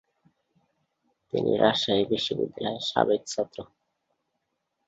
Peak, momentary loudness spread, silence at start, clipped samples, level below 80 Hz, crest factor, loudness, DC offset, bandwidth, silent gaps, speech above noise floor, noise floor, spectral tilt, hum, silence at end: -6 dBFS; 10 LU; 1.35 s; under 0.1%; -64 dBFS; 22 dB; -26 LUFS; under 0.1%; 8 kHz; none; 53 dB; -79 dBFS; -4.5 dB/octave; none; 1.2 s